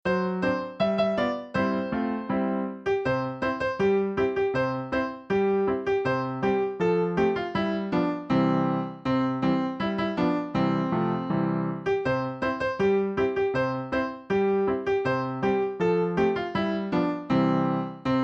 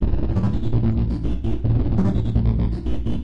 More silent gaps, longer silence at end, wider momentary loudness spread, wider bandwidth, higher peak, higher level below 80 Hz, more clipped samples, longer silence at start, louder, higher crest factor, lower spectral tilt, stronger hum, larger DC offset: neither; about the same, 0 s vs 0 s; about the same, 4 LU vs 5 LU; first, 7.6 kHz vs 5.6 kHz; second, -12 dBFS vs -6 dBFS; second, -54 dBFS vs -24 dBFS; neither; about the same, 0.05 s vs 0 s; second, -26 LUFS vs -22 LUFS; about the same, 14 dB vs 12 dB; second, -8 dB/octave vs -10 dB/octave; neither; second, under 0.1% vs 4%